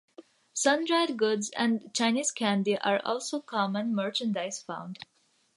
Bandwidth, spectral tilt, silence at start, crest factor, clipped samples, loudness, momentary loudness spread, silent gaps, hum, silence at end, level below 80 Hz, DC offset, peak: 11.5 kHz; -3.5 dB/octave; 0.2 s; 20 dB; under 0.1%; -28 LUFS; 12 LU; none; none; 0.5 s; -82 dBFS; under 0.1%; -10 dBFS